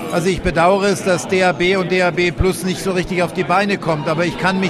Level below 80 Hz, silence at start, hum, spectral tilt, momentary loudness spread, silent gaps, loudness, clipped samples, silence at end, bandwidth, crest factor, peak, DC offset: -34 dBFS; 0 s; none; -5 dB/octave; 5 LU; none; -17 LUFS; under 0.1%; 0 s; 14.5 kHz; 14 dB; -2 dBFS; under 0.1%